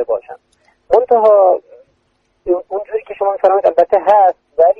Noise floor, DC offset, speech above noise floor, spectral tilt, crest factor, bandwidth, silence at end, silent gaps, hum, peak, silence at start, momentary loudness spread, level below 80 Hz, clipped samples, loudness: -62 dBFS; under 0.1%; 49 dB; -6.5 dB/octave; 14 dB; 5.4 kHz; 0.05 s; none; none; 0 dBFS; 0 s; 12 LU; -54 dBFS; under 0.1%; -13 LUFS